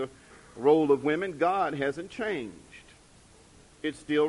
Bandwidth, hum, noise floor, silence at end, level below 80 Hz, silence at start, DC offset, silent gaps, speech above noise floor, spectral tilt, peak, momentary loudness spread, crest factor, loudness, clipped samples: 11.5 kHz; none; -56 dBFS; 0 s; -62 dBFS; 0 s; under 0.1%; none; 29 dB; -6 dB/octave; -10 dBFS; 16 LU; 18 dB; -28 LUFS; under 0.1%